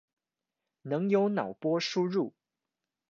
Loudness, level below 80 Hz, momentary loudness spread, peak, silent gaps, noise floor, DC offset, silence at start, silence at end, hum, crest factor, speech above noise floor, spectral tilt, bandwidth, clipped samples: -30 LUFS; -82 dBFS; 9 LU; -14 dBFS; none; -89 dBFS; under 0.1%; 0.85 s; 0.85 s; none; 18 dB; 60 dB; -6 dB/octave; 7.4 kHz; under 0.1%